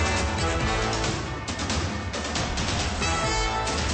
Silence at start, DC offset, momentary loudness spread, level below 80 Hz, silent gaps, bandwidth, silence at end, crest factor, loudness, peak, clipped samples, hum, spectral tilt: 0 s; under 0.1%; 5 LU; -34 dBFS; none; 8.8 kHz; 0 s; 14 dB; -26 LUFS; -14 dBFS; under 0.1%; none; -3.5 dB/octave